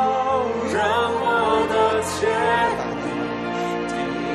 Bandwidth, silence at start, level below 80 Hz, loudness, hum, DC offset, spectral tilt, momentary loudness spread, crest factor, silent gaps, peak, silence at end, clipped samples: 13 kHz; 0 s; -50 dBFS; -21 LUFS; none; under 0.1%; -4.5 dB/octave; 7 LU; 14 dB; none; -8 dBFS; 0 s; under 0.1%